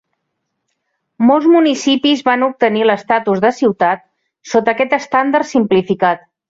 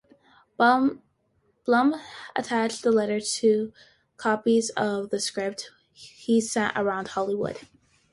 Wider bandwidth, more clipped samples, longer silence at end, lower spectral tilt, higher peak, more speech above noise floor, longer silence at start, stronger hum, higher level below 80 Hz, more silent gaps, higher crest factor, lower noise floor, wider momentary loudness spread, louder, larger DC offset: second, 7.8 kHz vs 11.5 kHz; neither; second, 0.35 s vs 0.5 s; about the same, -5 dB/octave vs -4 dB/octave; first, 0 dBFS vs -8 dBFS; first, 59 dB vs 44 dB; first, 1.2 s vs 0.6 s; neither; first, -60 dBFS vs -68 dBFS; neither; about the same, 14 dB vs 18 dB; first, -73 dBFS vs -69 dBFS; second, 5 LU vs 13 LU; first, -14 LUFS vs -25 LUFS; neither